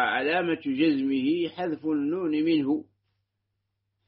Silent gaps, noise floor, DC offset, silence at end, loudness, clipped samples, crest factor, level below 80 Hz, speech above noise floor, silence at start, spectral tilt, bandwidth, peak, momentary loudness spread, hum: none; -80 dBFS; under 0.1%; 1.25 s; -26 LUFS; under 0.1%; 16 dB; -74 dBFS; 54 dB; 0 s; -3.5 dB/octave; 5.2 kHz; -10 dBFS; 5 LU; none